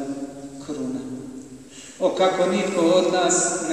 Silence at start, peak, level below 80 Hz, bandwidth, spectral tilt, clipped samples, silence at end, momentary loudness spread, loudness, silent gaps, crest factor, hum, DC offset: 0 s; -6 dBFS; -62 dBFS; 12.5 kHz; -3.5 dB/octave; under 0.1%; 0 s; 21 LU; -21 LUFS; none; 16 dB; none; 0.1%